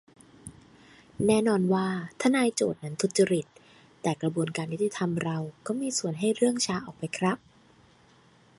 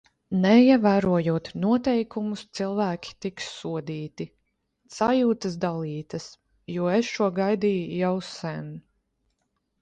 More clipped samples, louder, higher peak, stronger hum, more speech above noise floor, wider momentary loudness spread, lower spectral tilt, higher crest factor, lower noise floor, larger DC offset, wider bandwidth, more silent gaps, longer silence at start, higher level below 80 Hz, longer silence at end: neither; second, -28 LUFS vs -25 LUFS; second, -10 dBFS vs -6 dBFS; neither; second, 32 dB vs 51 dB; second, 11 LU vs 17 LU; second, -5 dB/octave vs -6.5 dB/octave; about the same, 18 dB vs 20 dB; second, -59 dBFS vs -75 dBFS; neither; first, 11.5 kHz vs 9 kHz; neither; first, 0.45 s vs 0.3 s; second, -66 dBFS vs -60 dBFS; first, 1.25 s vs 1 s